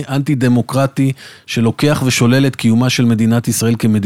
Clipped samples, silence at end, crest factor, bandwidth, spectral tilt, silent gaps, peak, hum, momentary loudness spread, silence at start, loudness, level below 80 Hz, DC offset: under 0.1%; 0 s; 12 dB; 16.5 kHz; -5.5 dB/octave; none; -2 dBFS; none; 5 LU; 0 s; -14 LUFS; -48 dBFS; under 0.1%